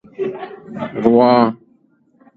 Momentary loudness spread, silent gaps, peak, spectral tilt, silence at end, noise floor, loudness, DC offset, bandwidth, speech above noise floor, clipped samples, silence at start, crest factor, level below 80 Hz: 20 LU; none; 0 dBFS; -9 dB/octave; 0.8 s; -56 dBFS; -15 LUFS; under 0.1%; 4.7 kHz; 42 dB; under 0.1%; 0.2 s; 18 dB; -60 dBFS